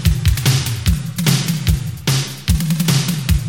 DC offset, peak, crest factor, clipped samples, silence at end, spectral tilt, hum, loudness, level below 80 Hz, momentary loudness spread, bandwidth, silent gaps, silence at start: 0.6%; -2 dBFS; 14 dB; under 0.1%; 0 s; -4.5 dB/octave; none; -17 LUFS; -24 dBFS; 4 LU; 17 kHz; none; 0 s